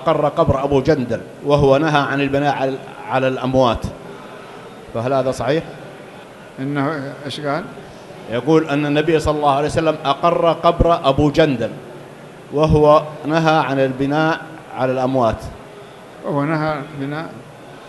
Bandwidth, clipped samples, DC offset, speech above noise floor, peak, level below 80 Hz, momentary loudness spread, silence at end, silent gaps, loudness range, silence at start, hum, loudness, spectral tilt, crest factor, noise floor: 12 kHz; under 0.1%; under 0.1%; 21 dB; 0 dBFS; -36 dBFS; 21 LU; 0 s; none; 7 LU; 0 s; none; -17 LUFS; -6.5 dB/octave; 18 dB; -38 dBFS